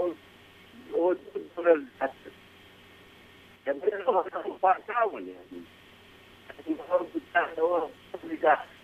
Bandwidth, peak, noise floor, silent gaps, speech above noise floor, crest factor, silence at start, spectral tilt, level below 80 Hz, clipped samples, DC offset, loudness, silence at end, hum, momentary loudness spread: 14 kHz; -8 dBFS; -54 dBFS; none; 25 dB; 22 dB; 0 s; -6 dB/octave; -70 dBFS; under 0.1%; under 0.1%; -29 LUFS; 0.15 s; none; 21 LU